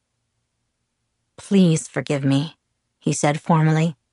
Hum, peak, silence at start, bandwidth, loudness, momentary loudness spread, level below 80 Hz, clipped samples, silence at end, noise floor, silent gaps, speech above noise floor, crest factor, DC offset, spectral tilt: none; -4 dBFS; 1.4 s; 11.5 kHz; -20 LUFS; 8 LU; -66 dBFS; under 0.1%; 0.2 s; -74 dBFS; none; 56 dB; 16 dB; under 0.1%; -6 dB/octave